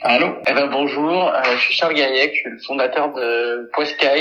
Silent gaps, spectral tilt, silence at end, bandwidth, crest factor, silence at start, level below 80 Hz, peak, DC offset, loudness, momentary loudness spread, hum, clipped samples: none; -4 dB/octave; 0 s; 10 kHz; 18 dB; 0 s; -72 dBFS; 0 dBFS; under 0.1%; -18 LUFS; 6 LU; none; under 0.1%